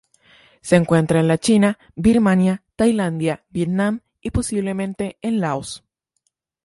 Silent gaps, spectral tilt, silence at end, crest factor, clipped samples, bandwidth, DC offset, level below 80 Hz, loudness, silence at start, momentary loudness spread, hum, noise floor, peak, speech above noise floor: none; -6.5 dB/octave; 0.85 s; 18 dB; under 0.1%; 11.5 kHz; under 0.1%; -44 dBFS; -19 LUFS; 0.65 s; 10 LU; none; -72 dBFS; 0 dBFS; 54 dB